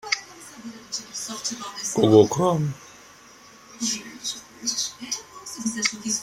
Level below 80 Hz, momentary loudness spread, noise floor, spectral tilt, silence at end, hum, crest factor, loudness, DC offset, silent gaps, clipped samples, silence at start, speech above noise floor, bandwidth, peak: -62 dBFS; 20 LU; -49 dBFS; -4 dB/octave; 0 s; none; 24 dB; -24 LUFS; under 0.1%; none; under 0.1%; 0.05 s; 27 dB; 16 kHz; -2 dBFS